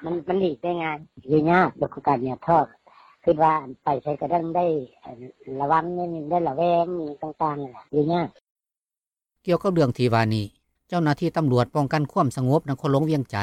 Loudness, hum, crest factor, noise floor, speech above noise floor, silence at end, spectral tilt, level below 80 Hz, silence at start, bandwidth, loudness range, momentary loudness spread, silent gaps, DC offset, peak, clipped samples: -24 LUFS; none; 18 dB; under -90 dBFS; over 67 dB; 0 s; -8 dB/octave; -58 dBFS; 0 s; 13 kHz; 3 LU; 10 LU; 8.52-8.56 s; under 0.1%; -6 dBFS; under 0.1%